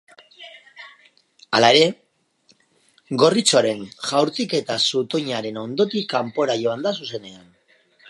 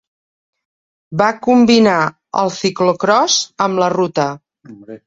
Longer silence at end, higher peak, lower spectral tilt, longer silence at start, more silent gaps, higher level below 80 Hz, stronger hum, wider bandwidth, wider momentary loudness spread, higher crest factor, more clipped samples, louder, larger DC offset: first, 0.75 s vs 0.1 s; about the same, -2 dBFS vs -2 dBFS; about the same, -3.5 dB/octave vs -4 dB/octave; second, 0.4 s vs 1.1 s; neither; second, -70 dBFS vs -56 dBFS; neither; first, 11.5 kHz vs 7.8 kHz; first, 19 LU vs 9 LU; first, 22 dB vs 14 dB; neither; second, -20 LUFS vs -14 LUFS; neither